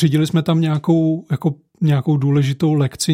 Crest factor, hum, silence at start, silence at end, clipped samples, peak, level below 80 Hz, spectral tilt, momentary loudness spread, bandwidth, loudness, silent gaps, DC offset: 14 dB; none; 0 s; 0 s; under 0.1%; -4 dBFS; -56 dBFS; -6.5 dB/octave; 5 LU; 15.5 kHz; -17 LUFS; none; under 0.1%